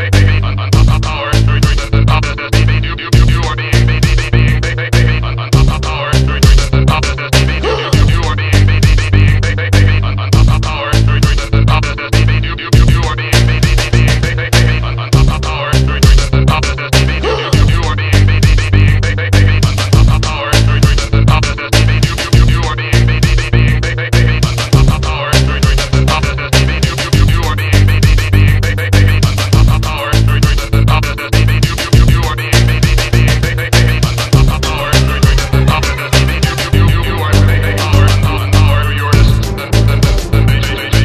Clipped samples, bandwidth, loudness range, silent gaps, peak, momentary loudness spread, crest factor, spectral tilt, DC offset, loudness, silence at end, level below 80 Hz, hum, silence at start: 0.4%; 14.5 kHz; 1 LU; none; 0 dBFS; 4 LU; 10 dB; -5.5 dB/octave; under 0.1%; -11 LUFS; 0 s; -14 dBFS; none; 0 s